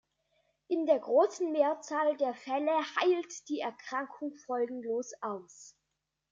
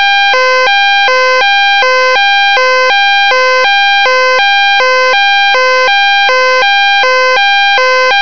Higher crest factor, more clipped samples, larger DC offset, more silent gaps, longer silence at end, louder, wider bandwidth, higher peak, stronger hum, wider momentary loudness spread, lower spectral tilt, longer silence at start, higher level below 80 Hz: first, 18 dB vs 8 dB; second, under 0.1% vs 10%; second, under 0.1% vs 5%; neither; first, 0.6 s vs 0 s; second, -32 LUFS vs -6 LUFS; first, 7.8 kHz vs 5.4 kHz; second, -14 dBFS vs 0 dBFS; neither; first, 12 LU vs 1 LU; first, -3 dB/octave vs 1 dB/octave; first, 0.7 s vs 0 s; second, -84 dBFS vs -62 dBFS